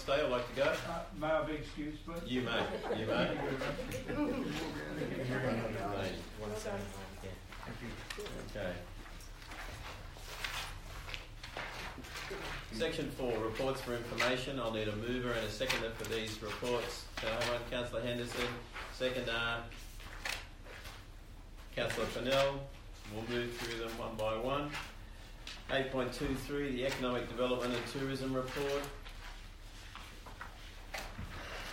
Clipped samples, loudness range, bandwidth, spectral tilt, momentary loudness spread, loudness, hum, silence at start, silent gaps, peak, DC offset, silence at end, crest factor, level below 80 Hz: under 0.1%; 8 LU; 16 kHz; -4.5 dB/octave; 15 LU; -38 LUFS; none; 0 s; none; -18 dBFS; under 0.1%; 0 s; 22 dB; -50 dBFS